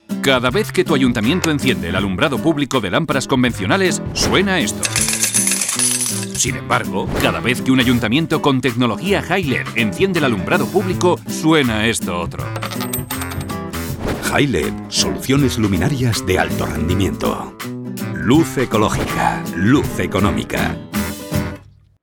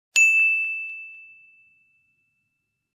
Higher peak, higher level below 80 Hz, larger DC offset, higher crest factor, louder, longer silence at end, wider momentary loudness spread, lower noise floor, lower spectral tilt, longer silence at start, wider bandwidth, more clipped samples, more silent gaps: first, 0 dBFS vs -6 dBFS; first, -38 dBFS vs -86 dBFS; neither; about the same, 18 dB vs 20 dB; about the same, -17 LUFS vs -18 LUFS; second, 0.4 s vs 1.75 s; second, 8 LU vs 22 LU; second, -38 dBFS vs -77 dBFS; first, -4 dB/octave vs 5 dB/octave; about the same, 0.1 s vs 0.15 s; first, 19.5 kHz vs 15 kHz; neither; neither